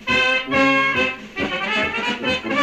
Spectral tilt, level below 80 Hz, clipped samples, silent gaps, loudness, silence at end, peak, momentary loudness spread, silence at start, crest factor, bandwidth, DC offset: -4 dB/octave; -48 dBFS; under 0.1%; none; -19 LUFS; 0 s; -6 dBFS; 7 LU; 0 s; 14 dB; 13 kHz; under 0.1%